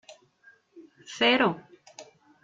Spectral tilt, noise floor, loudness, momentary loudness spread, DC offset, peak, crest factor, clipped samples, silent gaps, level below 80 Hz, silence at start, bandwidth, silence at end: -4 dB/octave; -60 dBFS; -24 LUFS; 27 LU; under 0.1%; -8 dBFS; 22 dB; under 0.1%; none; -74 dBFS; 0.1 s; 7.8 kHz; 0.4 s